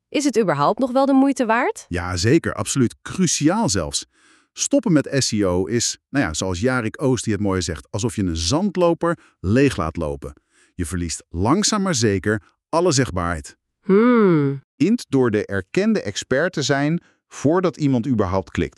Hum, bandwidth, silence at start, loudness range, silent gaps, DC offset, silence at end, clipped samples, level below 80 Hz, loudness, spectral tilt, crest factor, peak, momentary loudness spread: none; 13 kHz; 0.1 s; 3 LU; 14.64-14.78 s; under 0.1%; 0.1 s; under 0.1%; -44 dBFS; -20 LUFS; -5 dB/octave; 16 dB; -4 dBFS; 9 LU